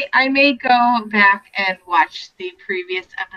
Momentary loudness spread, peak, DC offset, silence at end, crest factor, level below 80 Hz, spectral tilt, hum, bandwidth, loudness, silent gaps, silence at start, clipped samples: 13 LU; -2 dBFS; under 0.1%; 0 s; 16 dB; -64 dBFS; -4.5 dB/octave; none; 7.4 kHz; -16 LUFS; none; 0 s; under 0.1%